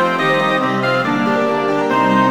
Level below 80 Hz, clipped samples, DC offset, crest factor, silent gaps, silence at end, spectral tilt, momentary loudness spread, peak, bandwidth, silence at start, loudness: -64 dBFS; under 0.1%; under 0.1%; 12 dB; none; 0 s; -6 dB/octave; 2 LU; -2 dBFS; over 20 kHz; 0 s; -15 LUFS